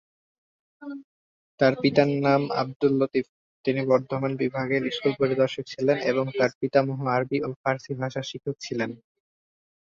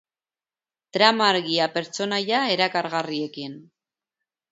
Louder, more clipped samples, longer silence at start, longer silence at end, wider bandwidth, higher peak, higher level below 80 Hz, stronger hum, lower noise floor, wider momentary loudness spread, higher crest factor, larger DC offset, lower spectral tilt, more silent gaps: second, -25 LUFS vs -22 LUFS; neither; second, 0.8 s vs 0.95 s; about the same, 0.95 s vs 0.9 s; about the same, 7.4 kHz vs 8 kHz; second, -4 dBFS vs 0 dBFS; first, -66 dBFS vs -76 dBFS; neither; about the same, under -90 dBFS vs under -90 dBFS; second, 11 LU vs 14 LU; about the same, 22 dB vs 24 dB; neither; first, -6.5 dB/octave vs -3.5 dB/octave; first, 1.04-1.58 s, 2.76-2.80 s, 3.29-3.64 s, 6.55-6.61 s, 7.56-7.64 s vs none